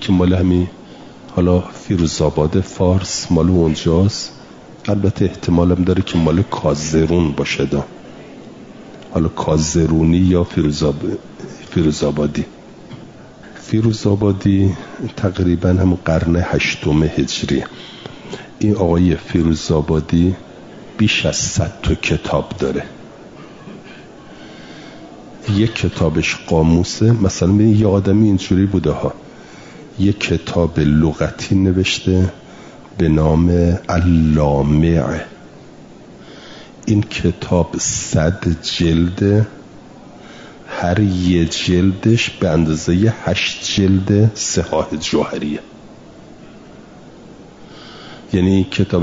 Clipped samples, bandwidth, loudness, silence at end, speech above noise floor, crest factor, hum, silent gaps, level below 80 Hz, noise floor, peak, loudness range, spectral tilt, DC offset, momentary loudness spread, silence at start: under 0.1%; 7.8 kHz; -16 LUFS; 0 s; 24 dB; 14 dB; none; none; -36 dBFS; -39 dBFS; -2 dBFS; 6 LU; -6 dB/octave; 0.1%; 22 LU; 0 s